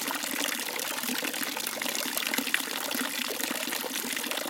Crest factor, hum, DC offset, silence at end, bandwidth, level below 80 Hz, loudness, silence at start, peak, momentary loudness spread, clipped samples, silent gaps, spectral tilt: 26 dB; none; under 0.1%; 0 s; 17 kHz; -80 dBFS; -29 LUFS; 0 s; -6 dBFS; 3 LU; under 0.1%; none; 0 dB/octave